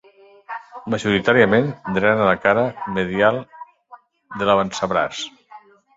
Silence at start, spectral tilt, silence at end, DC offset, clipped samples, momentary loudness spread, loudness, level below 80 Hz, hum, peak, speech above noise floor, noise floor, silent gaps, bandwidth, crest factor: 0.5 s; -5.5 dB/octave; 0.4 s; under 0.1%; under 0.1%; 18 LU; -19 LUFS; -54 dBFS; none; -2 dBFS; 29 dB; -48 dBFS; none; 7.8 kHz; 18 dB